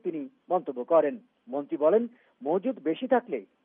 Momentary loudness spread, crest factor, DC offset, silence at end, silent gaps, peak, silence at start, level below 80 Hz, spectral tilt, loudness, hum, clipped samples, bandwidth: 13 LU; 18 dB; under 0.1%; 0.2 s; none; -10 dBFS; 0.05 s; under -90 dBFS; -5 dB/octave; -28 LUFS; none; under 0.1%; 3.8 kHz